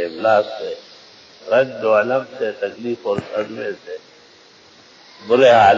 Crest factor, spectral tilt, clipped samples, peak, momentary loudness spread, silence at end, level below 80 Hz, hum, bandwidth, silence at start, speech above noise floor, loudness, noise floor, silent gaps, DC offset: 16 dB; -5.5 dB/octave; under 0.1%; -2 dBFS; 20 LU; 0 s; -58 dBFS; none; 7.6 kHz; 0 s; 31 dB; -18 LUFS; -48 dBFS; none; under 0.1%